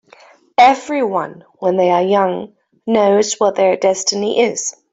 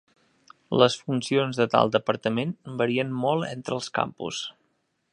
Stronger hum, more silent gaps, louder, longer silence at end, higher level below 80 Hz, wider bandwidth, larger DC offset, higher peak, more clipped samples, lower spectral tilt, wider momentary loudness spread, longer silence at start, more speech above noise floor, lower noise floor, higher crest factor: neither; neither; first, -15 LUFS vs -25 LUFS; second, 0.2 s vs 0.6 s; about the same, -62 dBFS vs -66 dBFS; second, 8.2 kHz vs 11 kHz; neither; about the same, -2 dBFS vs -2 dBFS; neither; second, -3.5 dB/octave vs -5 dB/octave; about the same, 11 LU vs 10 LU; about the same, 0.6 s vs 0.7 s; second, 32 dB vs 48 dB; second, -46 dBFS vs -72 dBFS; second, 14 dB vs 24 dB